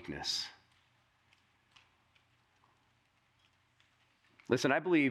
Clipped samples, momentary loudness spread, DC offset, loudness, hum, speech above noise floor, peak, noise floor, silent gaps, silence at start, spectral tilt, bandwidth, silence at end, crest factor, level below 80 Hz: under 0.1%; 15 LU; under 0.1%; -33 LUFS; none; 42 dB; -14 dBFS; -73 dBFS; none; 0 s; -4 dB/octave; 14 kHz; 0 s; 24 dB; -74 dBFS